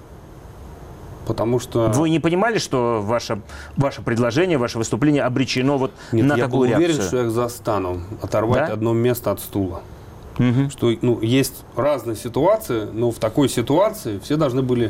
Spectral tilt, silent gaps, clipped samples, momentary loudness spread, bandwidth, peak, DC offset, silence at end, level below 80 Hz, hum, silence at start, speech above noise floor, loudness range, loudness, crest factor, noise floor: -6 dB/octave; none; under 0.1%; 10 LU; 16 kHz; -8 dBFS; under 0.1%; 0 s; -44 dBFS; none; 0 s; 20 dB; 2 LU; -20 LUFS; 12 dB; -40 dBFS